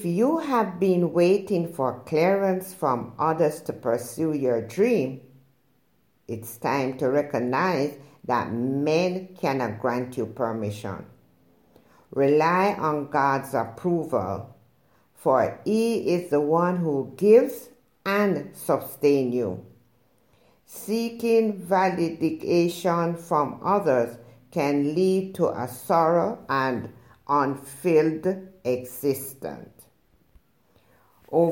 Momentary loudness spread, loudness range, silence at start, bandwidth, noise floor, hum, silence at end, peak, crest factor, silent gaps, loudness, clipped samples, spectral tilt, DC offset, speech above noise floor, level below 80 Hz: 10 LU; 5 LU; 0 s; 17 kHz; -67 dBFS; none; 0 s; -6 dBFS; 18 dB; none; -24 LUFS; under 0.1%; -6.5 dB/octave; under 0.1%; 43 dB; -68 dBFS